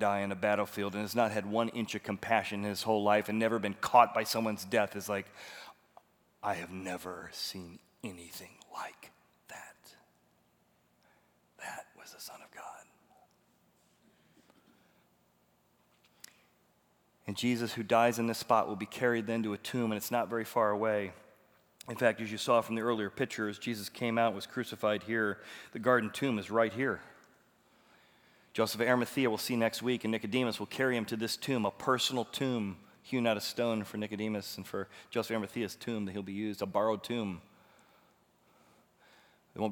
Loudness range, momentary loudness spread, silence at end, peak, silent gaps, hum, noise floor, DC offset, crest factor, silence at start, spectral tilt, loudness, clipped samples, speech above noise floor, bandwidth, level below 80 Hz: 20 LU; 17 LU; 0 s; -10 dBFS; none; none; -71 dBFS; under 0.1%; 26 dB; 0 s; -4.5 dB/octave; -33 LUFS; under 0.1%; 38 dB; over 20 kHz; -80 dBFS